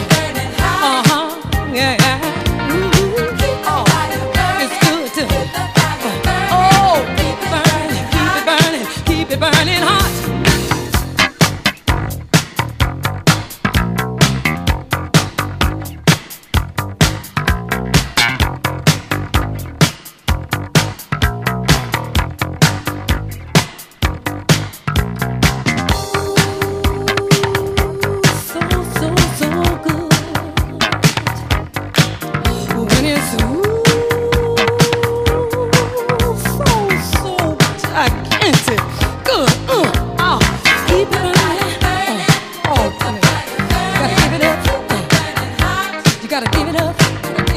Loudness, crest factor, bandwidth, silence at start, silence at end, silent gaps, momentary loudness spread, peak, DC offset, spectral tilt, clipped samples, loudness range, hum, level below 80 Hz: -15 LUFS; 16 dB; 15.5 kHz; 0 s; 0 s; none; 7 LU; 0 dBFS; under 0.1%; -4.5 dB/octave; under 0.1%; 3 LU; none; -26 dBFS